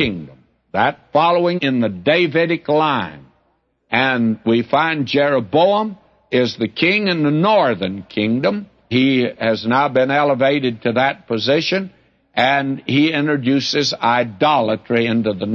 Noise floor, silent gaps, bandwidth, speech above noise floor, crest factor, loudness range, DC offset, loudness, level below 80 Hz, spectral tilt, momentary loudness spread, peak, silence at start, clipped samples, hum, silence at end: -64 dBFS; none; 7.2 kHz; 47 dB; 16 dB; 1 LU; under 0.1%; -17 LUFS; -58 dBFS; -6 dB/octave; 6 LU; -2 dBFS; 0 s; under 0.1%; none; 0 s